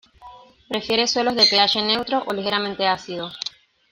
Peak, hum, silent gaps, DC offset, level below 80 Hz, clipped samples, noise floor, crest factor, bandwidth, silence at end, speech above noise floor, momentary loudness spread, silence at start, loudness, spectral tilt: -2 dBFS; none; none; under 0.1%; -60 dBFS; under 0.1%; -45 dBFS; 20 dB; 16 kHz; 0.45 s; 24 dB; 15 LU; 0.2 s; -19 LUFS; -2.5 dB/octave